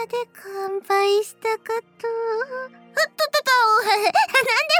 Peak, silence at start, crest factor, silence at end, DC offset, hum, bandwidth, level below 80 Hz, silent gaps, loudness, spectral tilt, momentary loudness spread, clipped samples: -6 dBFS; 0 s; 16 dB; 0 s; under 0.1%; none; over 20 kHz; -80 dBFS; none; -21 LUFS; -0.5 dB/octave; 12 LU; under 0.1%